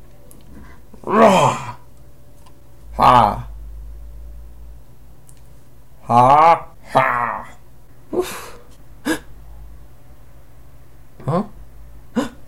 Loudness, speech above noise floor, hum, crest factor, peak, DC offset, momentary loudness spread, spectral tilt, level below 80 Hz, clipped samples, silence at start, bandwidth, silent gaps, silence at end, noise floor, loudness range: -16 LUFS; 35 dB; none; 20 dB; -2 dBFS; 1%; 26 LU; -5.5 dB/octave; -40 dBFS; under 0.1%; 1.05 s; 16.5 kHz; none; 0.1 s; -47 dBFS; 12 LU